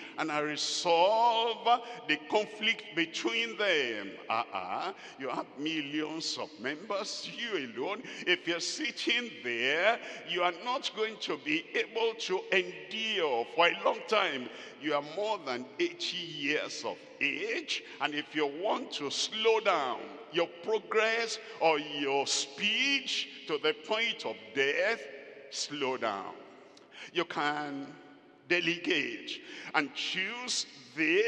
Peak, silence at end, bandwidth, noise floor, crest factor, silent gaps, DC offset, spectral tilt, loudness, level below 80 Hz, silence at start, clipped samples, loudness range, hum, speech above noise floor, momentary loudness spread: -8 dBFS; 0 s; 10.5 kHz; -54 dBFS; 24 dB; none; under 0.1%; -2 dB/octave; -31 LUFS; under -90 dBFS; 0 s; under 0.1%; 5 LU; none; 22 dB; 10 LU